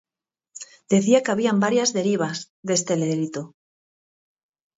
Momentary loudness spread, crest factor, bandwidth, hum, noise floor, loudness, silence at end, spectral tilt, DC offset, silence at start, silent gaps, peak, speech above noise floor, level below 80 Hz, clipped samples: 20 LU; 18 dB; 8 kHz; none; -84 dBFS; -22 LUFS; 1.3 s; -4.5 dB/octave; under 0.1%; 0.55 s; 2.50-2.63 s; -6 dBFS; 62 dB; -70 dBFS; under 0.1%